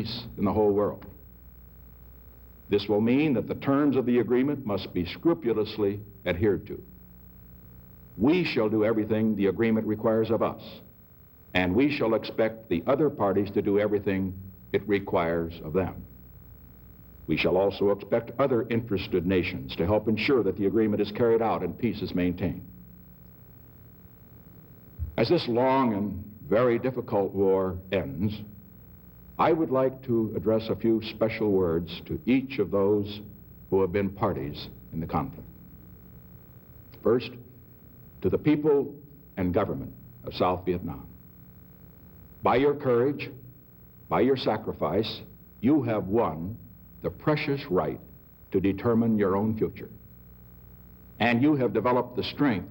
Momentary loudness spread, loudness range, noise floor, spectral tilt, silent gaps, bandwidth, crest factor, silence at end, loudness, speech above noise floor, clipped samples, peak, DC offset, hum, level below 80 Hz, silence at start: 14 LU; 5 LU; -53 dBFS; -9 dB/octave; none; 16 kHz; 18 dB; 0 s; -27 LUFS; 27 dB; under 0.1%; -10 dBFS; under 0.1%; none; -54 dBFS; 0 s